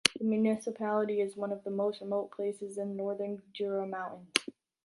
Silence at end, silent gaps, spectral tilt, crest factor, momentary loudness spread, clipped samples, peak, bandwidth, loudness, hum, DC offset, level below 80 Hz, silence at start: 0.35 s; none; -3.5 dB/octave; 32 dB; 8 LU; under 0.1%; -2 dBFS; 11.5 kHz; -34 LUFS; none; under 0.1%; -76 dBFS; 0.05 s